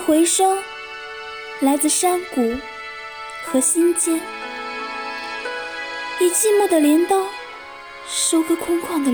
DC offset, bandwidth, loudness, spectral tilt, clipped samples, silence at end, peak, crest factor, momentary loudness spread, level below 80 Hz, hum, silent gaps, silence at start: 0.1%; over 20 kHz; -19 LUFS; -1.5 dB/octave; under 0.1%; 0 s; -6 dBFS; 14 dB; 16 LU; -56 dBFS; none; none; 0 s